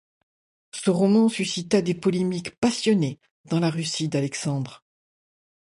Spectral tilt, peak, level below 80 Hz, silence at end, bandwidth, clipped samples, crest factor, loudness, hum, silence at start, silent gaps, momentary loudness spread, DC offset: -5.5 dB/octave; -8 dBFS; -64 dBFS; 0.9 s; 11.5 kHz; under 0.1%; 16 dB; -24 LUFS; none; 0.75 s; 2.58-2.62 s, 3.31-3.44 s; 9 LU; under 0.1%